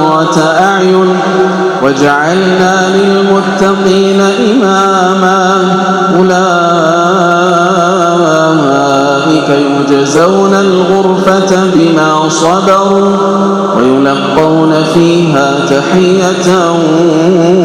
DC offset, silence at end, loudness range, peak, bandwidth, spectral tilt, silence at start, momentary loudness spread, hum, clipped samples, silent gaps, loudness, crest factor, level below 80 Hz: under 0.1%; 0 s; 0 LU; 0 dBFS; 13 kHz; -5.5 dB/octave; 0 s; 2 LU; none; 2%; none; -8 LUFS; 8 dB; -48 dBFS